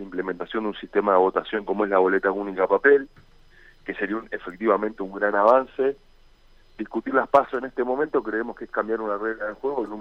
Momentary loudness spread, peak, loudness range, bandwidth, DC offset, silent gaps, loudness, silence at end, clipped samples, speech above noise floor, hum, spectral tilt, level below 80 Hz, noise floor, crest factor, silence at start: 11 LU; -4 dBFS; 3 LU; 6 kHz; under 0.1%; none; -23 LUFS; 0 s; under 0.1%; 30 dB; none; -7 dB/octave; -54 dBFS; -53 dBFS; 20 dB; 0 s